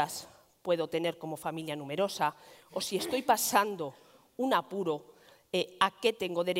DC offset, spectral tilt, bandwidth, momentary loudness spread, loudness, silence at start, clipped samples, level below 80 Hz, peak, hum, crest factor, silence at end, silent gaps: under 0.1%; -3.5 dB/octave; 16 kHz; 12 LU; -32 LUFS; 0 s; under 0.1%; -76 dBFS; -10 dBFS; none; 24 dB; 0 s; none